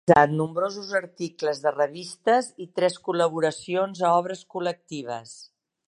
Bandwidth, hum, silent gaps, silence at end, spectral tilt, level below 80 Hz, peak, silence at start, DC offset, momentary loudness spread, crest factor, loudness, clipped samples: 11.5 kHz; none; none; 0.45 s; -5.5 dB/octave; -64 dBFS; -2 dBFS; 0.05 s; under 0.1%; 12 LU; 24 dB; -25 LUFS; under 0.1%